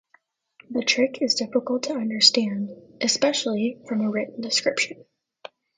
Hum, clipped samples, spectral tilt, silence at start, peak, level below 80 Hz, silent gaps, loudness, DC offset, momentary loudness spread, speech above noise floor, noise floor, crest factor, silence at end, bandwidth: none; under 0.1%; -2.5 dB/octave; 0.7 s; -2 dBFS; -74 dBFS; none; -23 LUFS; under 0.1%; 11 LU; 40 dB; -64 dBFS; 24 dB; 0.3 s; 9.6 kHz